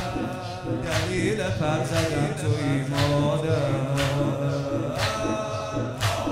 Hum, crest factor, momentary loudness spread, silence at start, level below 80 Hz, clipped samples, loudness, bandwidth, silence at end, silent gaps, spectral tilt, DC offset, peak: none; 16 dB; 6 LU; 0 s; -44 dBFS; under 0.1%; -25 LUFS; 16 kHz; 0 s; none; -5.5 dB/octave; under 0.1%; -10 dBFS